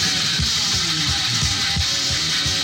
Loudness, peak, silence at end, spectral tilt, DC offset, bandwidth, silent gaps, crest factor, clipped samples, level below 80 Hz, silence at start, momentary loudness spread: -18 LUFS; -8 dBFS; 0 s; -1.5 dB/octave; under 0.1%; 17 kHz; none; 12 dB; under 0.1%; -36 dBFS; 0 s; 1 LU